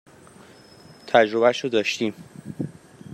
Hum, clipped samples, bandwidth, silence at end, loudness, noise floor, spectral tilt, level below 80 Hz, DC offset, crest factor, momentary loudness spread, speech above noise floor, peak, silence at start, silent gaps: none; under 0.1%; 13.5 kHz; 0 s; -22 LUFS; -48 dBFS; -4.5 dB/octave; -68 dBFS; under 0.1%; 22 dB; 21 LU; 28 dB; -2 dBFS; 1.05 s; none